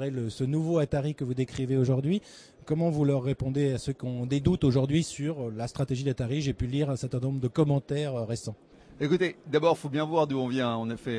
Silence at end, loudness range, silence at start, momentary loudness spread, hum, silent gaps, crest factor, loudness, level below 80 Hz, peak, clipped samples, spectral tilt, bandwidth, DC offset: 0 s; 2 LU; 0 s; 7 LU; none; none; 18 dB; -29 LUFS; -52 dBFS; -10 dBFS; under 0.1%; -7 dB/octave; 11 kHz; under 0.1%